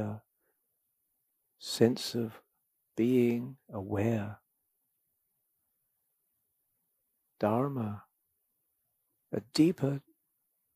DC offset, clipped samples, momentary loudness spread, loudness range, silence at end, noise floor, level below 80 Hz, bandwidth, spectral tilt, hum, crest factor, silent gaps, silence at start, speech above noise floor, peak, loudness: under 0.1%; under 0.1%; 16 LU; 8 LU; 0.75 s; -80 dBFS; -76 dBFS; 15.5 kHz; -6.5 dB/octave; none; 24 dB; none; 0 s; 49 dB; -10 dBFS; -32 LUFS